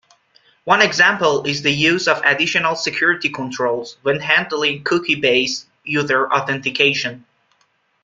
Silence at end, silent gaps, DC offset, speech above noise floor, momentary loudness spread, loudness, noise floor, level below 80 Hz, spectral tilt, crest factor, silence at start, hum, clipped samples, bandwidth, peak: 0.85 s; none; under 0.1%; 45 dB; 9 LU; -17 LUFS; -63 dBFS; -60 dBFS; -3.5 dB/octave; 18 dB; 0.65 s; none; under 0.1%; 9.4 kHz; 0 dBFS